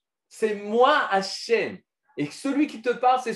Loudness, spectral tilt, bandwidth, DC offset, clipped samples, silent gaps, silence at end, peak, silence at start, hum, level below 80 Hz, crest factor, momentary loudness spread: -24 LUFS; -4 dB/octave; 12.5 kHz; under 0.1%; under 0.1%; none; 0 s; -6 dBFS; 0.35 s; none; -80 dBFS; 18 dB; 13 LU